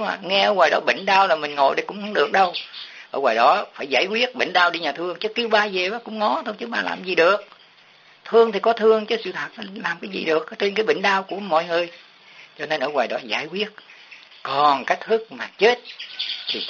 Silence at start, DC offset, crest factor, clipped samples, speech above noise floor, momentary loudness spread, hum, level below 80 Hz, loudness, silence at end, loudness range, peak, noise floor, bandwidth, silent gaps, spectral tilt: 0 s; under 0.1%; 18 dB; under 0.1%; 31 dB; 11 LU; none; -74 dBFS; -21 LUFS; 0 s; 4 LU; -4 dBFS; -52 dBFS; 7.2 kHz; none; -0.5 dB/octave